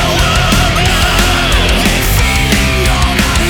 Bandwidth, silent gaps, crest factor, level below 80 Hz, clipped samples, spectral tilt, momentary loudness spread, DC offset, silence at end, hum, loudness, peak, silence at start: 20 kHz; none; 10 dB; -16 dBFS; under 0.1%; -3.5 dB/octave; 1 LU; under 0.1%; 0 s; none; -10 LUFS; 0 dBFS; 0 s